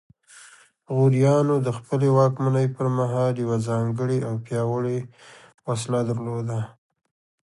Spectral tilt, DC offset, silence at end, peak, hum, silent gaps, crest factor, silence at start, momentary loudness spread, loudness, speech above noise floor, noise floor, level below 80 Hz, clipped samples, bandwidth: -8 dB/octave; under 0.1%; 0.75 s; -6 dBFS; none; 5.54-5.58 s; 16 dB; 0.35 s; 11 LU; -23 LUFS; 29 dB; -51 dBFS; -62 dBFS; under 0.1%; 11.5 kHz